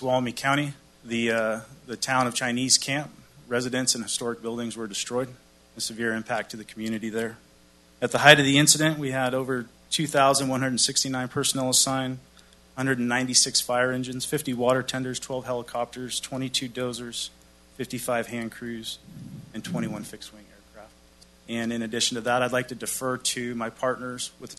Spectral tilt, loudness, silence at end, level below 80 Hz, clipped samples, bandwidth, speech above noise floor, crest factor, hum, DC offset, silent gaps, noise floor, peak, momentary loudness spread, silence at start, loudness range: -3 dB/octave; -25 LUFS; 0.05 s; -60 dBFS; under 0.1%; 12.5 kHz; 30 dB; 26 dB; none; under 0.1%; none; -56 dBFS; 0 dBFS; 14 LU; 0 s; 12 LU